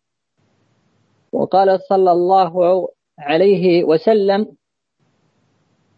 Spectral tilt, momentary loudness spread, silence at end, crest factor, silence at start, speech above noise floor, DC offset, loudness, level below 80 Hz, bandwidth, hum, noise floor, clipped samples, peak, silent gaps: -8.5 dB/octave; 12 LU; 1.5 s; 14 dB; 1.35 s; 53 dB; under 0.1%; -15 LUFS; -68 dBFS; 5.4 kHz; none; -67 dBFS; under 0.1%; -2 dBFS; none